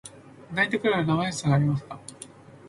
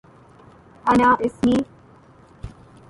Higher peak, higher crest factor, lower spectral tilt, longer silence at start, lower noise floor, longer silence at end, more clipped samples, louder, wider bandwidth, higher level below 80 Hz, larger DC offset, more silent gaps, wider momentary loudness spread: second, -10 dBFS vs -6 dBFS; about the same, 18 dB vs 18 dB; about the same, -6 dB/octave vs -6.5 dB/octave; second, 0.05 s vs 0.85 s; about the same, -47 dBFS vs -49 dBFS; second, 0 s vs 0.4 s; neither; second, -25 LUFS vs -19 LUFS; about the same, 11.5 kHz vs 11.5 kHz; second, -56 dBFS vs -46 dBFS; neither; neither; second, 21 LU vs 25 LU